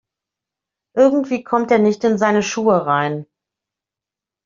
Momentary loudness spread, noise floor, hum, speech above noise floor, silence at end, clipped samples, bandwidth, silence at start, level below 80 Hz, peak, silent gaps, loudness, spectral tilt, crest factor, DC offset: 7 LU; -88 dBFS; none; 72 dB; 1.2 s; under 0.1%; 7.6 kHz; 0.95 s; -62 dBFS; -2 dBFS; none; -17 LUFS; -5 dB/octave; 16 dB; under 0.1%